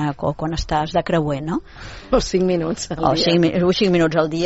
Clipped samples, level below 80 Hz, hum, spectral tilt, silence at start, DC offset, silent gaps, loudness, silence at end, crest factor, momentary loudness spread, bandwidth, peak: under 0.1%; -36 dBFS; none; -5 dB/octave; 0 s; under 0.1%; none; -19 LUFS; 0 s; 16 dB; 9 LU; 8 kHz; -2 dBFS